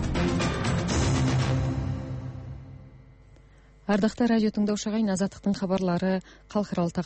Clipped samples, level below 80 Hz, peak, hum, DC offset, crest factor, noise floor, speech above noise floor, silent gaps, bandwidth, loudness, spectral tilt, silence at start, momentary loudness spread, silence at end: under 0.1%; -40 dBFS; -12 dBFS; none; under 0.1%; 14 dB; -53 dBFS; 28 dB; none; 8.8 kHz; -27 LUFS; -6 dB/octave; 0 s; 13 LU; 0 s